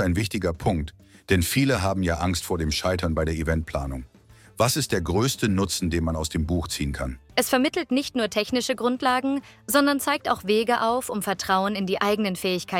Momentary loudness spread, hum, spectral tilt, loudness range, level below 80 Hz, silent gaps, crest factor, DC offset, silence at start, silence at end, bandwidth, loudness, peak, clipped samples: 6 LU; none; -4.5 dB/octave; 2 LU; -42 dBFS; none; 20 dB; under 0.1%; 0 s; 0 s; 17.5 kHz; -24 LUFS; -4 dBFS; under 0.1%